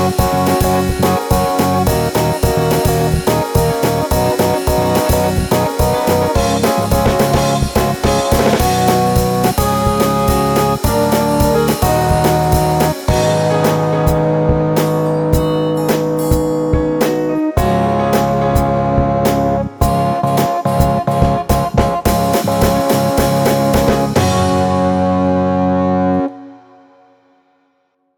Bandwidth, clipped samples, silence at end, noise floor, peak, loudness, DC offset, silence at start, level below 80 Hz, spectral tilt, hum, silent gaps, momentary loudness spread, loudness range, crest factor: over 20 kHz; under 0.1%; 1.6 s; -62 dBFS; 0 dBFS; -14 LUFS; under 0.1%; 0 s; -26 dBFS; -6 dB/octave; none; none; 2 LU; 1 LU; 14 dB